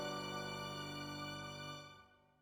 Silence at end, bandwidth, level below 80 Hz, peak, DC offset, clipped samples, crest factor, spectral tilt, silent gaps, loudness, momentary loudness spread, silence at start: 0.15 s; over 20 kHz; -70 dBFS; -32 dBFS; under 0.1%; under 0.1%; 14 dB; -4 dB/octave; none; -46 LUFS; 10 LU; 0 s